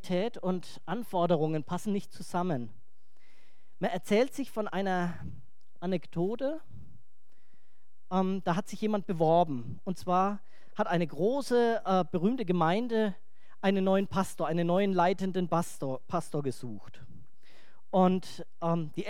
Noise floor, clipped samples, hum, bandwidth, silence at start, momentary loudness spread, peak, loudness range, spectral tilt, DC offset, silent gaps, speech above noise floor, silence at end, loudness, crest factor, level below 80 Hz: -78 dBFS; under 0.1%; none; 15.5 kHz; 0.05 s; 11 LU; -12 dBFS; 5 LU; -7 dB/octave; 1%; none; 48 dB; 0 s; -31 LUFS; 20 dB; -68 dBFS